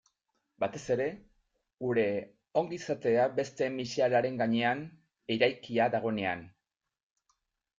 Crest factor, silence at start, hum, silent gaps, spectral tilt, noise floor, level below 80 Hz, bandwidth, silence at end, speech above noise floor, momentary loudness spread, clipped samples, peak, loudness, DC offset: 20 dB; 0.6 s; none; none; -5.5 dB/octave; -81 dBFS; -70 dBFS; 7.8 kHz; 1.3 s; 50 dB; 10 LU; under 0.1%; -12 dBFS; -31 LUFS; under 0.1%